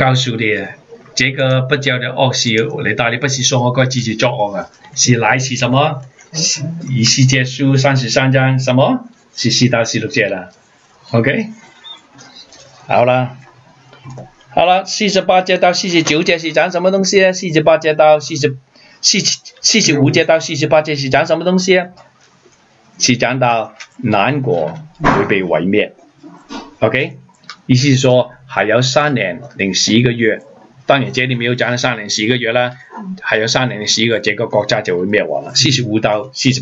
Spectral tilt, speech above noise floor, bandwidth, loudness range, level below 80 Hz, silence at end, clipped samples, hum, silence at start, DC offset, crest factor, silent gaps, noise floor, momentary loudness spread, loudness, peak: -4 dB/octave; 35 dB; 8 kHz; 5 LU; -48 dBFS; 0 s; under 0.1%; none; 0 s; under 0.1%; 14 dB; none; -49 dBFS; 9 LU; -14 LUFS; 0 dBFS